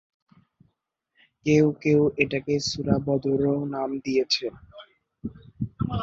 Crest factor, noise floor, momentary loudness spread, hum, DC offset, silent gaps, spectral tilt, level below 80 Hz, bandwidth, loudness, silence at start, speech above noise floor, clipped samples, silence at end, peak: 20 dB; -76 dBFS; 15 LU; none; under 0.1%; none; -6 dB/octave; -50 dBFS; 7.8 kHz; -24 LUFS; 1.45 s; 53 dB; under 0.1%; 0 s; -6 dBFS